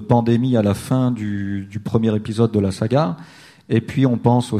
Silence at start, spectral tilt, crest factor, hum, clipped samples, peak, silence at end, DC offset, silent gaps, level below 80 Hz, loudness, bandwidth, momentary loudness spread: 0 s; -8 dB/octave; 18 dB; none; under 0.1%; 0 dBFS; 0 s; under 0.1%; none; -50 dBFS; -19 LUFS; 13 kHz; 8 LU